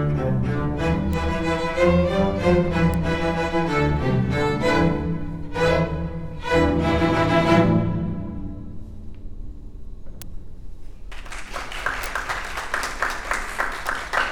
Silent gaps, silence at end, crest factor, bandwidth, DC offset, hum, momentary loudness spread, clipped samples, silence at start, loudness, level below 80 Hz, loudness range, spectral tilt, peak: none; 0 s; 18 dB; 19 kHz; under 0.1%; none; 22 LU; under 0.1%; 0 s; -22 LUFS; -34 dBFS; 13 LU; -6.5 dB/octave; -4 dBFS